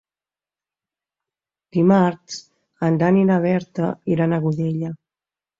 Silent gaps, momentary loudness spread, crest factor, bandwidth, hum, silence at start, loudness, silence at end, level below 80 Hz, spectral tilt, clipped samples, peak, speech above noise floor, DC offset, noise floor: none; 16 LU; 16 dB; 7.6 kHz; none; 1.75 s; -19 LUFS; 0.65 s; -60 dBFS; -8 dB/octave; under 0.1%; -4 dBFS; over 71 dB; under 0.1%; under -90 dBFS